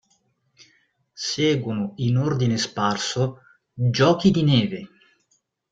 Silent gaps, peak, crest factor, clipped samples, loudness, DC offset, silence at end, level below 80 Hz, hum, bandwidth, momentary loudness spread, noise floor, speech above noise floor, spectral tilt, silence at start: none; -4 dBFS; 18 dB; under 0.1%; -22 LUFS; under 0.1%; 0.85 s; -56 dBFS; none; 8.8 kHz; 10 LU; -69 dBFS; 48 dB; -5.5 dB/octave; 1.15 s